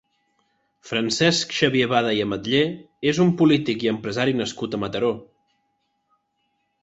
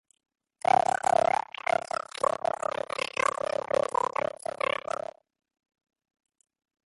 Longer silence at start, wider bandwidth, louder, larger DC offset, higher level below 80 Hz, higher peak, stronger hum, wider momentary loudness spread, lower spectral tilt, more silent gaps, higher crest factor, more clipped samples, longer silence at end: about the same, 0.85 s vs 0.75 s; second, 8.2 kHz vs 11.5 kHz; first, -21 LUFS vs -29 LUFS; neither; first, -58 dBFS vs -68 dBFS; first, -2 dBFS vs -10 dBFS; neither; about the same, 8 LU vs 9 LU; first, -5 dB/octave vs -2.5 dB/octave; neither; about the same, 20 dB vs 20 dB; neither; second, 1.6 s vs 3.55 s